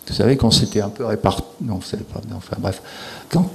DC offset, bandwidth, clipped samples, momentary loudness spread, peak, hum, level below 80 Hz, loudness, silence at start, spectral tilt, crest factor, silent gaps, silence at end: under 0.1%; 13.5 kHz; under 0.1%; 16 LU; 0 dBFS; none; -38 dBFS; -20 LUFS; 0.05 s; -5.5 dB/octave; 20 dB; none; 0 s